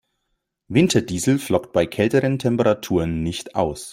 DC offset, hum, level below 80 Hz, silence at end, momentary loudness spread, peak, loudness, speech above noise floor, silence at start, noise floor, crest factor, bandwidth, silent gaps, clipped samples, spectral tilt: under 0.1%; none; -48 dBFS; 0 s; 6 LU; -2 dBFS; -20 LUFS; 55 dB; 0.7 s; -75 dBFS; 18 dB; 16 kHz; none; under 0.1%; -5.5 dB/octave